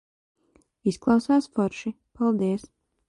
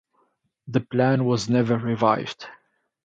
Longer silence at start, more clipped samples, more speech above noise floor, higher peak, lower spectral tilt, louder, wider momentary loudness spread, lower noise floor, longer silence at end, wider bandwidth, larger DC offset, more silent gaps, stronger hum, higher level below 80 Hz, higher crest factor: first, 0.85 s vs 0.65 s; neither; second, 31 dB vs 47 dB; about the same, -8 dBFS vs -6 dBFS; about the same, -7 dB/octave vs -6.5 dB/octave; second, -25 LUFS vs -22 LUFS; about the same, 12 LU vs 14 LU; second, -55 dBFS vs -69 dBFS; about the same, 0.5 s vs 0.5 s; first, 11.5 kHz vs 9 kHz; neither; neither; neither; about the same, -60 dBFS vs -62 dBFS; about the same, 18 dB vs 18 dB